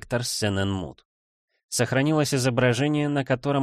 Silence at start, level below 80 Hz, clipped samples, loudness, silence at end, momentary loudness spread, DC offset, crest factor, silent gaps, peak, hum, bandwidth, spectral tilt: 0.1 s; -54 dBFS; under 0.1%; -24 LUFS; 0 s; 7 LU; under 0.1%; 14 dB; 1.05-1.48 s, 1.64-1.69 s; -10 dBFS; none; 15 kHz; -5 dB/octave